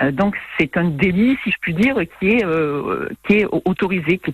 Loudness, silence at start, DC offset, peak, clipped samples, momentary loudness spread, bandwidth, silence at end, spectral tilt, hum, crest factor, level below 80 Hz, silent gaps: -18 LUFS; 0 s; under 0.1%; -2 dBFS; under 0.1%; 5 LU; 13.5 kHz; 0 s; -8 dB/octave; none; 16 dB; -46 dBFS; none